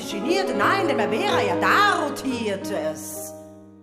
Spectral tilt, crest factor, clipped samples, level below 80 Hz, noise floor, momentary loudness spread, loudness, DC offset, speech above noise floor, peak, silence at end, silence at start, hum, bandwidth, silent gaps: -4 dB/octave; 16 dB; under 0.1%; -62 dBFS; -42 dBFS; 15 LU; -22 LUFS; under 0.1%; 20 dB; -6 dBFS; 0 s; 0 s; none; 15.5 kHz; none